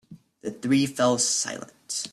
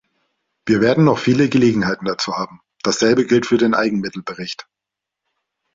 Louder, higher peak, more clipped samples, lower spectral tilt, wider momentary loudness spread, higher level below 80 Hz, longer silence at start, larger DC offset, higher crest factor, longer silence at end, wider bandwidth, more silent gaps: second, -24 LUFS vs -17 LUFS; second, -10 dBFS vs -2 dBFS; neither; second, -3 dB/octave vs -5.5 dB/octave; about the same, 16 LU vs 14 LU; second, -68 dBFS vs -54 dBFS; second, 0.1 s vs 0.65 s; neither; about the same, 16 dB vs 16 dB; second, 0.05 s vs 1.15 s; first, 13.5 kHz vs 7.8 kHz; neither